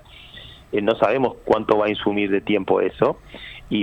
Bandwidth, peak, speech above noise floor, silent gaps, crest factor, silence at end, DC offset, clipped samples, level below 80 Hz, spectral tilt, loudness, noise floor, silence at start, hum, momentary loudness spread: 8.4 kHz; -2 dBFS; 22 dB; none; 20 dB; 0 s; under 0.1%; under 0.1%; -50 dBFS; -7.5 dB/octave; -21 LUFS; -42 dBFS; 0.15 s; none; 20 LU